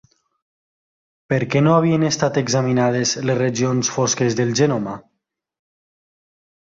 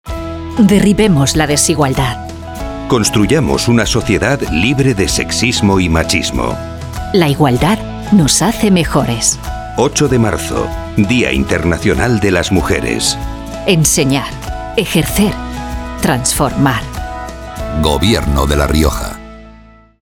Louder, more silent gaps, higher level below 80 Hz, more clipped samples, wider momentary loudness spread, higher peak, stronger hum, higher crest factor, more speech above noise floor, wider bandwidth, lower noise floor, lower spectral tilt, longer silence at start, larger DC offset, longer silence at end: second, -18 LUFS vs -13 LUFS; neither; second, -56 dBFS vs -24 dBFS; neither; second, 7 LU vs 13 LU; second, -4 dBFS vs 0 dBFS; neither; first, 18 dB vs 12 dB; first, 58 dB vs 28 dB; second, 7.8 kHz vs 19 kHz; first, -76 dBFS vs -40 dBFS; about the same, -5 dB/octave vs -4.5 dB/octave; first, 1.3 s vs 0.05 s; neither; first, 1.75 s vs 0.5 s